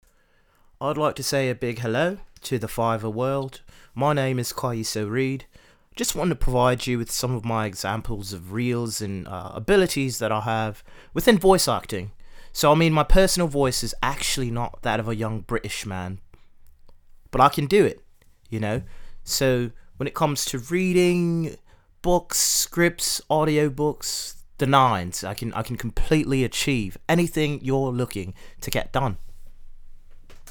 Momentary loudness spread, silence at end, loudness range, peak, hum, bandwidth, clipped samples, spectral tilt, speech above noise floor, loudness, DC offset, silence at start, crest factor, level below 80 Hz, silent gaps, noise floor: 13 LU; 0 s; 5 LU; 0 dBFS; none; 19.5 kHz; under 0.1%; -4.5 dB/octave; 38 dB; -23 LUFS; under 0.1%; 0.8 s; 22 dB; -36 dBFS; none; -61 dBFS